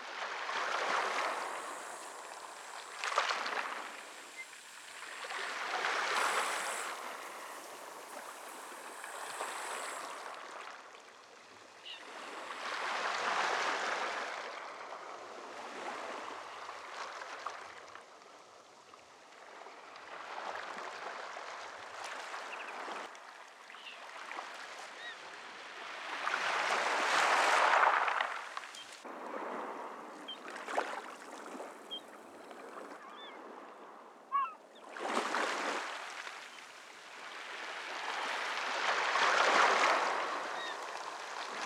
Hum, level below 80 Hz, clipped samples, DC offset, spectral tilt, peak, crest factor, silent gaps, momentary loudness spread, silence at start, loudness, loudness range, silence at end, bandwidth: none; under -90 dBFS; under 0.1%; under 0.1%; 0 dB/octave; -12 dBFS; 26 dB; none; 19 LU; 0 s; -36 LUFS; 14 LU; 0 s; 19.5 kHz